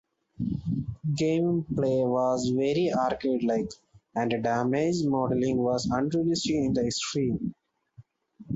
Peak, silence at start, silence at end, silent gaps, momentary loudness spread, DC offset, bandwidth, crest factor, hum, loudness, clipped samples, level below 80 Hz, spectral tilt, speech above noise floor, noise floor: -14 dBFS; 0.4 s; 0 s; none; 7 LU; under 0.1%; 8 kHz; 14 dB; none; -27 LUFS; under 0.1%; -54 dBFS; -6 dB/octave; 29 dB; -55 dBFS